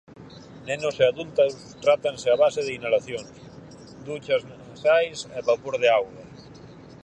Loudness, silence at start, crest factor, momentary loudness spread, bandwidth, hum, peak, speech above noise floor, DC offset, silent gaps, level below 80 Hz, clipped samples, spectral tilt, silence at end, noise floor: -24 LUFS; 0.2 s; 18 dB; 24 LU; 9.2 kHz; none; -6 dBFS; 22 dB; under 0.1%; none; -62 dBFS; under 0.1%; -4 dB/octave; 0.25 s; -45 dBFS